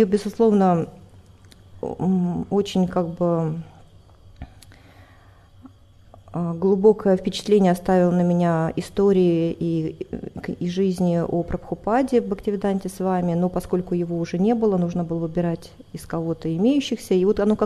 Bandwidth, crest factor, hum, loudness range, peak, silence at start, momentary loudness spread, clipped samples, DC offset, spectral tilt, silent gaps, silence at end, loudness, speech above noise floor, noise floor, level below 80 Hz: 13 kHz; 18 dB; none; 7 LU; -4 dBFS; 0 s; 11 LU; under 0.1%; under 0.1%; -7.5 dB/octave; none; 0 s; -22 LUFS; 29 dB; -50 dBFS; -48 dBFS